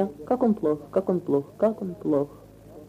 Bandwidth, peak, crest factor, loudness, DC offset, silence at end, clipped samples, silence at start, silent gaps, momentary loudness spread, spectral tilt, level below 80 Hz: 15 kHz; -10 dBFS; 16 dB; -26 LUFS; under 0.1%; 0 s; under 0.1%; 0 s; none; 4 LU; -9.5 dB/octave; -60 dBFS